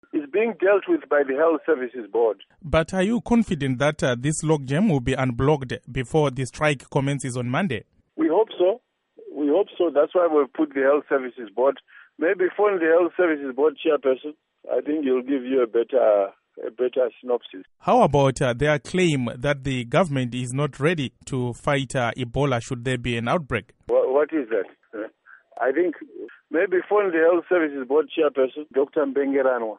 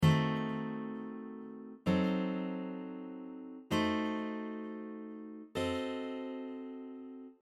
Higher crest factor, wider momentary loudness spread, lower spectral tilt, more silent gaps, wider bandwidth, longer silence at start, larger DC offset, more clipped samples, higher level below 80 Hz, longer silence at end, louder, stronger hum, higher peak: about the same, 18 dB vs 20 dB; second, 8 LU vs 15 LU; about the same, -6 dB/octave vs -7 dB/octave; neither; second, 11.5 kHz vs 14 kHz; first, 0.15 s vs 0 s; neither; neither; first, -48 dBFS vs -64 dBFS; about the same, 0.05 s vs 0.1 s; first, -23 LUFS vs -38 LUFS; neither; first, -6 dBFS vs -16 dBFS